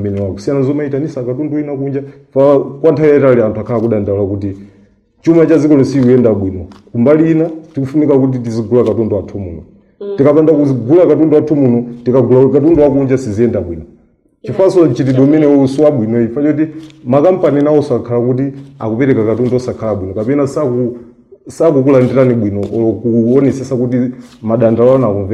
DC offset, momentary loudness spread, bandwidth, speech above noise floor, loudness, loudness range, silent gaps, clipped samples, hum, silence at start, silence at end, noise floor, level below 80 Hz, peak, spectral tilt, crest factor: under 0.1%; 12 LU; 10 kHz; 38 dB; -12 LUFS; 3 LU; none; under 0.1%; none; 0 s; 0 s; -49 dBFS; -46 dBFS; 0 dBFS; -9 dB/octave; 10 dB